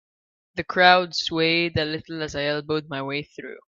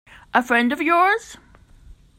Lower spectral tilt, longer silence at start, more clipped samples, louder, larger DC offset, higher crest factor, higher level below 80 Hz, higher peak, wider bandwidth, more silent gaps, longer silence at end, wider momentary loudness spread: about the same, -4.5 dB/octave vs -3.5 dB/octave; first, 0.55 s vs 0.35 s; neither; second, -22 LUFS vs -19 LUFS; neither; first, 24 dB vs 18 dB; about the same, -56 dBFS vs -52 dBFS; about the same, 0 dBFS vs -2 dBFS; second, 7.6 kHz vs 16 kHz; neither; second, 0.15 s vs 0.85 s; first, 17 LU vs 6 LU